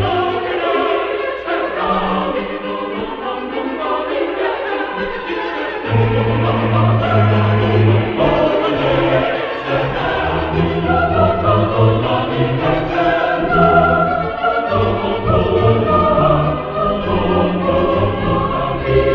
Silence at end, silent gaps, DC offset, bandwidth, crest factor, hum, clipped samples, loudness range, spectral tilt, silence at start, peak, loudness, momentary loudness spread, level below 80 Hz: 0 s; none; under 0.1%; 5.8 kHz; 14 dB; none; under 0.1%; 5 LU; -9 dB/octave; 0 s; 0 dBFS; -16 LUFS; 8 LU; -34 dBFS